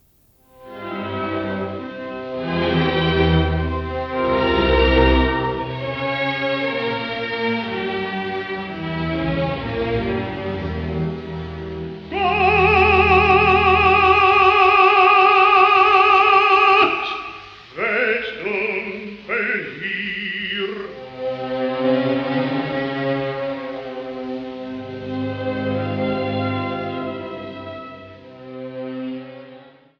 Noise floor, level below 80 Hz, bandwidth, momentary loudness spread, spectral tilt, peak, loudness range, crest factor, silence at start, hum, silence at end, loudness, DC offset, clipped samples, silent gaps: -56 dBFS; -34 dBFS; 6.8 kHz; 18 LU; -7 dB/octave; -2 dBFS; 13 LU; 18 dB; 0.6 s; none; 0.35 s; -18 LUFS; under 0.1%; under 0.1%; none